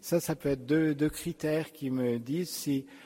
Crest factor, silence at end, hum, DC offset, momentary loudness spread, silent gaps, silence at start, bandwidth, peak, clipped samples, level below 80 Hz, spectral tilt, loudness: 16 dB; 0 s; none; under 0.1%; 6 LU; none; 0.05 s; 16.5 kHz; -16 dBFS; under 0.1%; -58 dBFS; -5.5 dB/octave; -31 LUFS